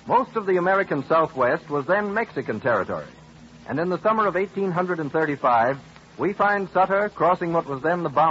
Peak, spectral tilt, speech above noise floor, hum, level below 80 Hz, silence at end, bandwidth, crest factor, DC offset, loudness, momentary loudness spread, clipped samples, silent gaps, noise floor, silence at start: -8 dBFS; -7.5 dB/octave; 24 dB; none; -60 dBFS; 0 s; 7.8 kHz; 14 dB; under 0.1%; -23 LUFS; 7 LU; under 0.1%; none; -46 dBFS; 0.05 s